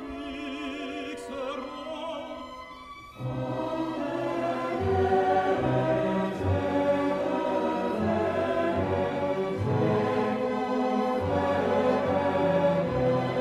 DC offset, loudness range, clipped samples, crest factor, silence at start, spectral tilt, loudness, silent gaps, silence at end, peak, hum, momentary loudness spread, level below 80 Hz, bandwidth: under 0.1%; 9 LU; under 0.1%; 14 dB; 0 s; -7.5 dB/octave; -28 LUFS; none; 0 s; -12 dBFS; none; 11 LU; -54 dBFS; 13 kHz